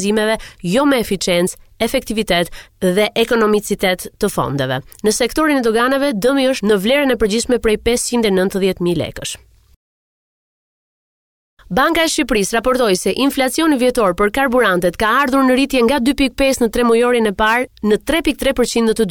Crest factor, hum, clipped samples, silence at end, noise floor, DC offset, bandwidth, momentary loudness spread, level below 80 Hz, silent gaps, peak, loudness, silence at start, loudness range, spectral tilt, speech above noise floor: 12 dB; none; under 0.1%; 0 s; under -90 dBFS; 0.3%; 19 kHz; 6 LU; -38 dBFS; 9.76-11.57 s; -4 dBFS; -15 LUFS; 0 s; 6 LU; -4 dB/octave; over 75 dB